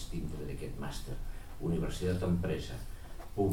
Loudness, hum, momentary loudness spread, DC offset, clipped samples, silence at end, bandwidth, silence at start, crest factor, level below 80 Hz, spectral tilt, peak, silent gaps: -37 LUFS; none; 13 LU; 0.4%; under 0.1%; 0 s; 17 kHz; 0 s; 16 dB; -42 dBFS; -6.5 dB/octave; -18 dBFS; none